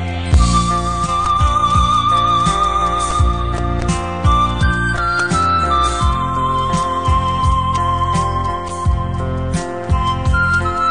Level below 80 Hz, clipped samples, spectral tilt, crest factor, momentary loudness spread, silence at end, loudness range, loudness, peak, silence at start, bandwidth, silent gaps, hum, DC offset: -22 dBFS; under 0.1%; -5 dB/octave; 14 dB; 6 LU; 0 s; 3 LU; -16 LUFS; 0 dBFS; 0 s; 10 kHz; none; none; 1%